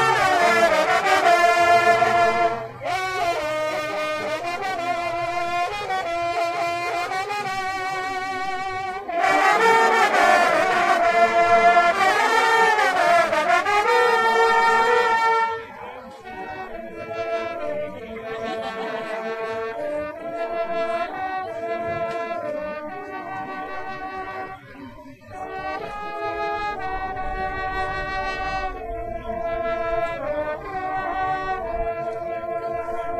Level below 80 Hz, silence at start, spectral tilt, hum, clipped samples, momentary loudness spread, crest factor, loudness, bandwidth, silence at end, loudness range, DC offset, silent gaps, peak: -46 dBFS; 0 s; -3 dB/octave; none; under 0.1%; 15 LU; 20 dB; -21 LUFS; 15.5 kHz; 0 s; 13 LU; under 0.1%; none; -2 dBFS